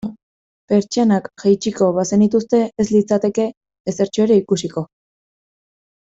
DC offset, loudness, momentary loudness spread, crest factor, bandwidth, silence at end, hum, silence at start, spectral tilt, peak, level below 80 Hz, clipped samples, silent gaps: under 0.1%; -17 LUFS; 11 LU; 14 dB; 8 kHz; 1.15 s; none; 0.05 s; -6 dB/octave; -4 dBFS; -56 dBFS; under 0.1%; 0.23-0.68 s, 3.57-3.61 s, 3.80-3.85 s